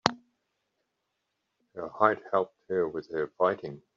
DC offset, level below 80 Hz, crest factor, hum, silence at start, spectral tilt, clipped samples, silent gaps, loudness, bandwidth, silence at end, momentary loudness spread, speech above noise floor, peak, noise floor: under 0.1%; -72 dBFS; 30 dB; none; 0.05 s; -3 dB/octave; under 0.1%; none; -29 LUFS; 7.4 kHz; 0.2 s; 14 LU; 52 dB; -2 dBFS; -81 dBFS